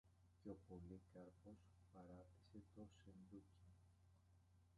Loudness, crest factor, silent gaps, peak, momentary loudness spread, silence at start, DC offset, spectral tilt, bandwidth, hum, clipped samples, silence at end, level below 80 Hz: -64 LUFS; 20 dB; none; -44 dBFS; 7 LU; 0.05 s; under 0.1%; -8 dB/octave; 11 kHz; none; under 0.1%; 0 s; -76 dBFS